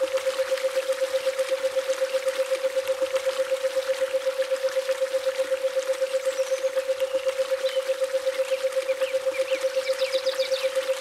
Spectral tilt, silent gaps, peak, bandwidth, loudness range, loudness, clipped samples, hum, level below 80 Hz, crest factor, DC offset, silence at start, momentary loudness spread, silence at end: 0 dB/octave; none; -12 dBFS; 15 kHz; 0 LU; -26 LUFS; under 0.1%; none; -74 dBFS; 14 dB; under 0.1%; 0 s; 1 LU; 0 s